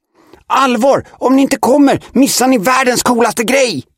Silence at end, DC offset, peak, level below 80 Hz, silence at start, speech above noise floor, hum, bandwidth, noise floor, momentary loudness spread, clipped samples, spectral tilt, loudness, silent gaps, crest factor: 0.15 s; under 0.1%; 0 dBFS; -50 dBFS; 0.5 s; 32 dB; none; 16.5 kHz; -43 dBFS; 3 LU; under 0.1%; -3.5 dB/octave; -11 LUFS; none; 12 dB